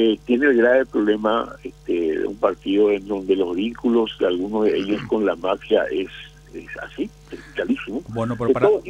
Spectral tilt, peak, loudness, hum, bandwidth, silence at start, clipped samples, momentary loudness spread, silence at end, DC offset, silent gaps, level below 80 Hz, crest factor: -6.5 dB/octave; -4 dBFS; -21 LUFS; none; 9.2 kHz; 0 s; under 0.1%; 15 LU; 0 s; under 0.1%; none; -50 dBFS; 18 dB